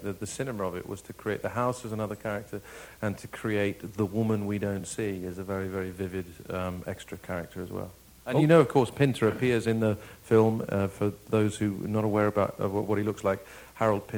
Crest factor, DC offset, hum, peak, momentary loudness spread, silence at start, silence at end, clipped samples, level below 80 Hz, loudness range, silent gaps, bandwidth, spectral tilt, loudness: 22 dB; under 0.1%; none; -6 dBFS; 13 LU; 0 s; 0 s; under 0.1%; -58 dBFS; 9 LU; none; over 20 kHz; -6.5 dB/octave; -29 LUFS